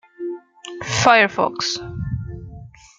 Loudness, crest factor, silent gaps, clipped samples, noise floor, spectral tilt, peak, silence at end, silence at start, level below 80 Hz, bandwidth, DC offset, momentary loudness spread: -18 LUFS; 20 dB; none; under 0.1%; -40 dBFS; -3.5 dB/octave; -2 dBFS; 0.3 s; 0.2 s; -44 dBFS; 9.4 kHz; under 0.1%; 22 LU